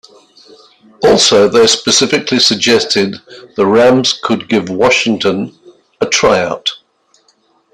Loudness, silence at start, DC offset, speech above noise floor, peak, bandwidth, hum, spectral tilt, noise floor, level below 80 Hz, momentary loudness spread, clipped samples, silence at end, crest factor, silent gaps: -11 LUFS; 1 s; under 0.1%; 44 dB; 0 dBFS; 15 kHz; none; -3 dB/octave; -55 dBFS; -48 dBFS; 11 LU; under 0.1%; 1 s; 12 dB; none